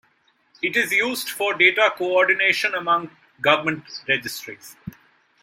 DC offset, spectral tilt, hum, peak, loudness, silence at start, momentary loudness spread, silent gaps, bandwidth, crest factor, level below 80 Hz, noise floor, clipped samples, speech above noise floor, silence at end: under 0.1%; -3 dB/octave; none; -2 dBFS; -20 LUFS; 0.65 s; 21 LU; none; 16.5 kHz; 20 dB; -66 dBFS; -63 dBFS; under 0.1%; 42 dB; 0.5 s